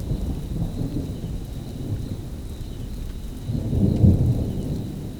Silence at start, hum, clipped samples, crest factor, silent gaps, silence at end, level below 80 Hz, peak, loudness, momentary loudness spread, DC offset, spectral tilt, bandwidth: 0 s; none; under 0.1%; 20 dB; none; 0 s; -32 dBFS; -4 dBFS; -26 LUFS; 16 LU; under 0.1%; -8.5 dB/octave; 19.5 kHz